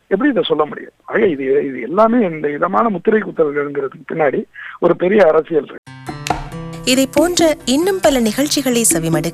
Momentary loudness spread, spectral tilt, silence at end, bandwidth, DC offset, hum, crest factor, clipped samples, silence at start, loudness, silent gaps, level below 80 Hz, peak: 11 LU; -4 dB/octave; 0 s; 15.5 kHz; under 0.1%; none; 14 dB; under 0.1%; 0.1 s; -16 LUFS; 5.78-5.83 s; -44 dBFS; -2 dBFS